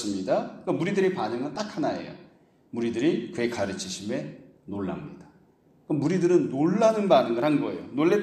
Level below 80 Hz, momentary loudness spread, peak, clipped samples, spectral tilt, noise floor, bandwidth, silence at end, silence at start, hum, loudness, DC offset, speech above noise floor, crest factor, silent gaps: -66 dBFS; 13 LU; -8 dBFS; under 0.1%; -6 dB/octave; -60 dBFS; 12.5 kHz; 0 s; 0 s; none; -26 LUFS; under 0.1%; 35 dB; 20 dB; none